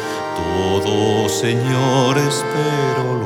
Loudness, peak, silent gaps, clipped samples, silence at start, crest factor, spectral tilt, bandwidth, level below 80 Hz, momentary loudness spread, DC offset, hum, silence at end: -17 LUFS; -4 dBFS; none; under 0.1%; 0 s; 14 dB; -5 dB/octave; 17 kHz; -48 dBFS; 5 LU; under 0.1%; none; 0 s